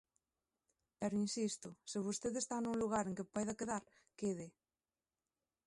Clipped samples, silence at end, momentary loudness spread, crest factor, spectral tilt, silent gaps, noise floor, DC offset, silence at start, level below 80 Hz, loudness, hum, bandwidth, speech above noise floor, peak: under 0.1%; 1.2 s; 7 LU; 18 dB; -4.5 dB/octave; none; under -90 dBFS; under 0.1%; 1 s; -74 dBFS; -41 LUFS; none; 11.5 kHz; over 49 dB; -26 dBFS